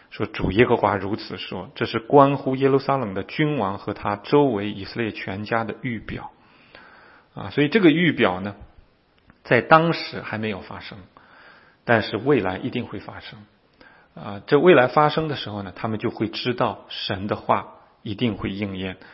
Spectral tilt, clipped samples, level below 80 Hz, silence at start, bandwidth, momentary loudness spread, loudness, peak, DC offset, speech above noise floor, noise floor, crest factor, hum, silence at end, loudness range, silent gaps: -10.5 dB/octave; under 0.1%; -52 dBFS; 0.1 s; 5.8 kHz; 19 LU; -22 LUFS; 0 dBFS; under 0.1%; 36 dB; -58 dBFS; 22 dB; none; 0.2 s; 5 LU; none